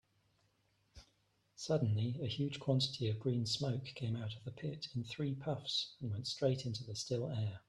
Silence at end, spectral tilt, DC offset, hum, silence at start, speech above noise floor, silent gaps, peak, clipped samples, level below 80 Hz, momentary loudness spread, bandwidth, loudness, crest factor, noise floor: 0.1 s; -5.5 dB/octave; under 0.1%; none; 0.95 s; 38 dB; none; -20 dBFS; under 0.1%; -70 dBFS; 8 LU; 11.5 kHz; -39 LUFS; 18 dB; -77 dBFS